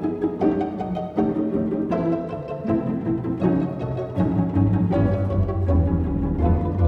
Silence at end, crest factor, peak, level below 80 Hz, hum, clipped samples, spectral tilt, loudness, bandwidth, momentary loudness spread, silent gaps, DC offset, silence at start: 0 s; 14 dB; -8 dBFS; -32 dBFS; none; under 0.1%; -11 dB/octave; -23 LUFS; 5.2 kHz; 6 LU; none; under 0.1%; 0 s